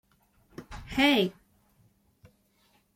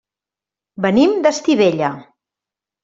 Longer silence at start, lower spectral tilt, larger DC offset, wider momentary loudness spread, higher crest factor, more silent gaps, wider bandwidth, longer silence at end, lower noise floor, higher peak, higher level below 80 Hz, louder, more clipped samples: second, 0.6 s vs 0.8 s; about the same, -4.5 dB/octave vs -5.5 dB/octave; neither; first, 26 LU vs 9 LU; about the same, 20 dB vs 16 dB; neither; first, 16.5 kHz vs 7.8 kHz; first, 1.65 s vs 0.8 s; second, -68 dBFS vs -88 dBFS; second, -12 dBFS vs -2 dBFS; about the same, -56 dBFS vs -58 dBFS; second, -26 LUFS vs -16 LUFS; neither